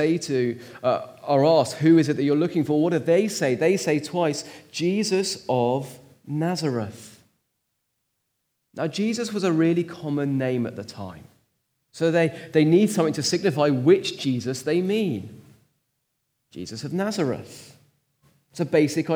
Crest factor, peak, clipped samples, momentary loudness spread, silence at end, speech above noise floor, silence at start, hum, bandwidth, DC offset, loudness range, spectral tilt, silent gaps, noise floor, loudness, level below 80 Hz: 18 dB; -6 dBFS; under 0.1%; 15 LU; 0 s; 53 dB; 0 s; none; over 20 kHz; under 0.1%; 9 LU; -5.5 dB/octave; none; -76 dBFS; -23 LUFS; -72 dBFS